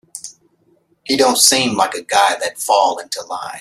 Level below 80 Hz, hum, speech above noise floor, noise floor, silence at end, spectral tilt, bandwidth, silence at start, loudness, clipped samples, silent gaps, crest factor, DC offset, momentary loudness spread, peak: -62 dBFS; none; 43 dB; -58 dBFS; 0 s; -1 dB/octave; 16 kHz; 0.15 s; -15 LUFS; under 0.1%; none; 18 dB; under 0.1%; 22 LU; 0 dBFS